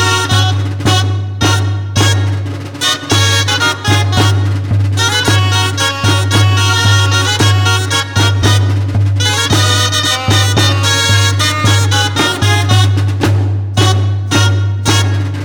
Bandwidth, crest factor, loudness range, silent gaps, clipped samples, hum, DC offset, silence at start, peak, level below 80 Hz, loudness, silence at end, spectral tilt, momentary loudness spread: 18 kHz; 10 dB; 2 LU; none; under 0.1%; none; under 0.1%; 0 s; 0 dBFS; -38 dBFS; -11 LUFS; 0 s; -4 dB/octave; 5 LU